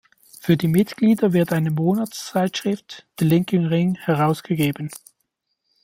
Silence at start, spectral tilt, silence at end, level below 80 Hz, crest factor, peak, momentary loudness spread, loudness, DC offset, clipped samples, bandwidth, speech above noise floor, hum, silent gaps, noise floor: 0.45 s; -7 dB/octave; 0.85 s; -58 dBFS; 18 dB; -4 dBFS; 12 LU; -21 LUFS; under 0.1%; under 0.1%; 16.5 kHz; 54 dB; none; none; -74 dBFS